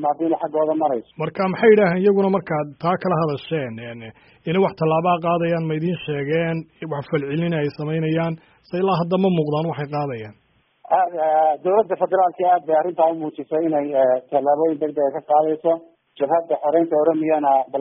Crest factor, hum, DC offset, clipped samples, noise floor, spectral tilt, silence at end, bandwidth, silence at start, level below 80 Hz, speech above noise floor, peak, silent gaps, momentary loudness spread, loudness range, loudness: 18 dB; none; under 0.1%; under 0.1%; -48 dBFS; -6 dB/octave; 0 s; 5.6 kHz; 0 s; -62 dBFS; 29 dB; -2 dBFS; none; 9 LU; 3 LU; -20 LUFS